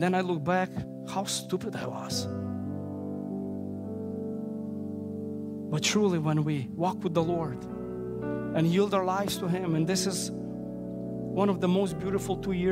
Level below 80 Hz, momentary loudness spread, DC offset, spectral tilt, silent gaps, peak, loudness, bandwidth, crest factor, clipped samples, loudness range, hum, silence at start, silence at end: -58 dBFS; 11 LU; under 0.1%; -5.5 dB/octave; none; -12 dBFS; -30 LUFS; 16 kHz; 18 dB; under 0.1%; 6 LU; none; 0 s; 0 s